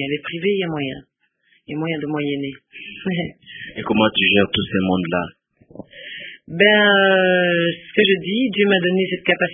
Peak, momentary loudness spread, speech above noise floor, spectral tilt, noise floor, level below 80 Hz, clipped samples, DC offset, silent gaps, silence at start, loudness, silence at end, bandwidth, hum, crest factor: 0 dBFS; 19 LU; 43 dB; -10.5 dB/octave; -61 dBFS; -52 dBFS; under 0.1%; under 0.1%; none; 0 s; -18 LUFS; 0 s; 3.8 kHz; none; 20 dB